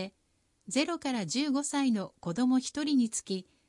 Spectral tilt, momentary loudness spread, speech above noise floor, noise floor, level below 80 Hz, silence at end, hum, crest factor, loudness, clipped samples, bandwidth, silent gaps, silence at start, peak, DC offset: -4 dB/octave; 7 LU; 43 dB; -73 dBFS; -74 dBFS; 0.25 s; none; 14 dB; -31 LUFS; under 0.1%; 11.5 kHz; none; 0 s; -16 dBFS; under 0.1%